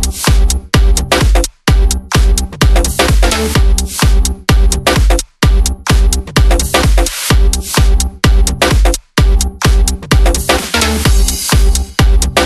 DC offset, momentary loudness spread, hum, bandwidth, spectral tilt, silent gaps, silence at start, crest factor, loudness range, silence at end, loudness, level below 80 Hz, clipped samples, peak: under 0.1%; 2 LU; none; 13 kHz; -4 dB/octave; none; 0 s; 10 dB; 0 LU; 0 s; -12 LUFS; -12 dBFS; under 0.1%; 0 dBFS